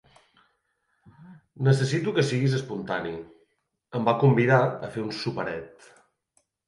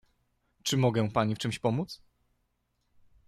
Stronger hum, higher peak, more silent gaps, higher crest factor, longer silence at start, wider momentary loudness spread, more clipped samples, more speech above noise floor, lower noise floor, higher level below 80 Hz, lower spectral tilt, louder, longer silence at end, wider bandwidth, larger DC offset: second, none vs 60 Hz at -55 dBFS; first, -6 dBFS vs -14 dBFS; neither; about the same, 20 dB vs 18 dB; first, 1.2 s vs 0.65 s; first, 15 LU vs 11 LU; neither; about the same, 49 dB vs 48 dB; about the same, -74 dBFS vs -77 dBFS; about the same, -64 dBFS vs -62 dBFS; about the same, -6.5 dB/octave vs -5.5 dB/octave; first, -25 LUFS vs -29 LUFS; second, 1 s vs 1.3 s; second, 11.5 kHz vs 13.5 kHz; neither